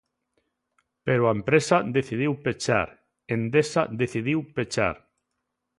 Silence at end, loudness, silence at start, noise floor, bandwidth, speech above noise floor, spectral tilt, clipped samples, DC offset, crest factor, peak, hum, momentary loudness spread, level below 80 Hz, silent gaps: 0.8 s; -25 LUFS; 1.05 s; -80 dBFS; 11.5 kHz; 56 dB; -5.5 dB/octave; under 0.1%; under 0.1%; 20 dB; -6 dBFS; none; 8 LU; -56 dBFS; none